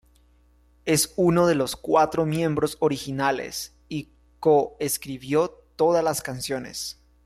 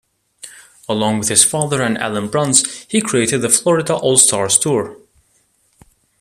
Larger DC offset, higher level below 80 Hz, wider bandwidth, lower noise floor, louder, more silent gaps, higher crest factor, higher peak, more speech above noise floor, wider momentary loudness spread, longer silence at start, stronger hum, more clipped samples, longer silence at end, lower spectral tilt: neither; about the same, -54 dBFS vs -56 dBFS; about the same, 16 kHz vs 15 kHz; about the same, -59 dBFS vs -60 dBFS; second, -24 LUFS vs -14 LUFS; neither; about the same, 16 dB vs 18 dB; second, -8 dBFS vs 0 dBFS; second, 35 dB vs 44 dB; first, 13 LU vs 10 LU; first, 0.85 s vs 0.45 s; first, 60 Hz at -55 dBFS vs none; neither; second, 0.35 s vs 1.25 s; first, -4.5 dB/octave vs -3 dB/octave